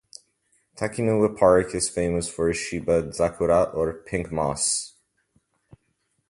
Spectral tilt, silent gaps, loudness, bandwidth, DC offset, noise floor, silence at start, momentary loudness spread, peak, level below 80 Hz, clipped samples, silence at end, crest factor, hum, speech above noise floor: -4.5 dB/octave; none; -23 LUFS; 11.5 kHz; under 0.1%; -72 dBFS; 0.75 s; 10 LU; -4 dBFS; -46 dBFS; under 0.1%; 1.4 s; 20 dB; none; 49 dB